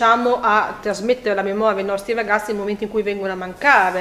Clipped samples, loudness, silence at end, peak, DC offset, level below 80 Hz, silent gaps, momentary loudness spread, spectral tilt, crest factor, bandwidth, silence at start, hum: under 0.1%; -19 LUFS; 0 s; 0 dBFS; under 0.1%; -52 dBFS; none; 9 LU; -4.5 dB/octave; 18 dB; 15.5 kHz; 0 s; none